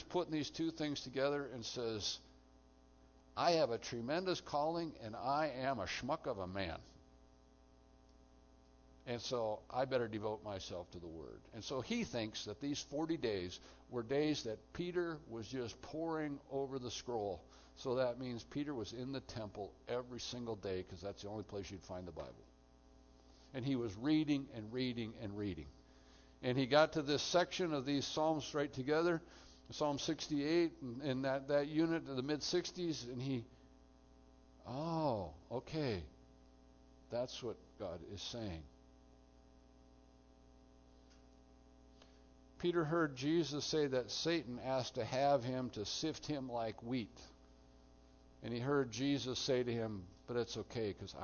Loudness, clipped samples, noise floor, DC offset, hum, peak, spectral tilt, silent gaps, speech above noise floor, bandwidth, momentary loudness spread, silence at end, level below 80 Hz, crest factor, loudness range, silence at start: -40 LUFS; under 0.1%; -66 dBFS; under 0.1%; none; -18 dBFS; -4.5 dB/octave; none; 26 dB; 6.8 kHz; 13 LU; 0 s; -66 dBFS; 24 dB; 9 LU; 0 s